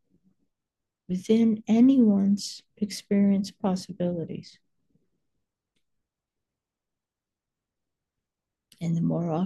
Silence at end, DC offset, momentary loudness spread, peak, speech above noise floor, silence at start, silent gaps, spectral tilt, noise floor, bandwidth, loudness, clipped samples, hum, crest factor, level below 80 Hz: 0 s; under 0.1%; 15 LU; -10 dBFS; 65 dB; 1.1 s; none; -7 dB/octave; -89 dBFS; 12.5 kHz; -25 LUFS; under 0.1%; none; 16 dB; -70 dBFS